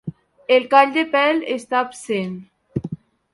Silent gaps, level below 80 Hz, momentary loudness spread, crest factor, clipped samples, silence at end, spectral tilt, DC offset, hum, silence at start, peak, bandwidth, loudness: none; -56 dBFS; 21 LU; 20 dB; under 0.1%; 0.4 s; -5 dB/octave; under 0.1%; none; 0.05 s; 0 dBFS; 11.5 kHz; -18 LUFS